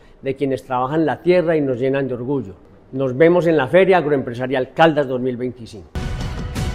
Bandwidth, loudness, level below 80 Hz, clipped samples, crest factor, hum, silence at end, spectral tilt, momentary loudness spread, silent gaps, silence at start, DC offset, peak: 13.5 kHz; -18 LUFS; -36 dBFS; under 0.1%; 18 dB; none; 0 s; -7 dB/octave; 14 LU; none; 0.25 s; under 0.1%; 0 dBFS